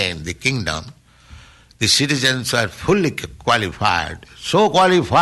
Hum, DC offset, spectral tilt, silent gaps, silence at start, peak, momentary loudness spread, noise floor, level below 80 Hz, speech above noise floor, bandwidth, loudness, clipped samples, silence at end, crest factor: none; under 0.1%; -3.5 dB/octave; none; 0 s; -4 dBFS; 11 LU; -44 dBFS; -42 dBFS; 26 dB; 12.5 kHz; -17 LUFS; under 0.1%; 0 s; 16 dB